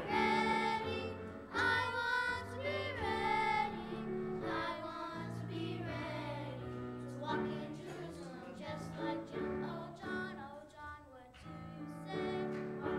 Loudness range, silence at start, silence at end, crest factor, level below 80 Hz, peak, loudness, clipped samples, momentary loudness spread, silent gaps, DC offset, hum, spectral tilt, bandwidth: 8 LU; 0 s; 0 s; 18 dB; -64 dBFS; -22 dBFS; -39 LUFS; under 0.1%; 15 LU; none; under 0.1%; none; -5.5 dB/octave; 14.5 kHz